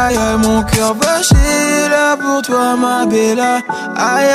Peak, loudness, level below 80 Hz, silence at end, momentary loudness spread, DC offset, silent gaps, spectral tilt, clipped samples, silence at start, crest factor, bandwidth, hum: 0 dBFS; -13 LUFS; -24 dBFS; 0 s; 4 LU; under 0.1%; none; -4 dB/octave; under 0.1%; 0 s; 12 dB; 15.5 kHz; none